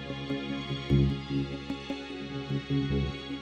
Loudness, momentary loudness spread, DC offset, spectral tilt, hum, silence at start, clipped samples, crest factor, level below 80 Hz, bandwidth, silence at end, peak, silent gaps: -32 LUFS; 11 LU; under 0.1%; -7.5 dB/octave; none; 0 s; under 0.1%; 18 dB; -42 dBFS; 8 kHz; 0 s; -12 dBFS; none